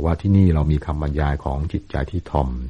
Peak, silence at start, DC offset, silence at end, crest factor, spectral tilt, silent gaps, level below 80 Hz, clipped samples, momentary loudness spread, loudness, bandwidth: -4 dBFS; 0 s; under 0.1%; 0 s; 16 dB; -9.5 dB/octave; none; -26 dBFS; under 0.1%; 10 LU; -21 LUFS; 6.2 kHz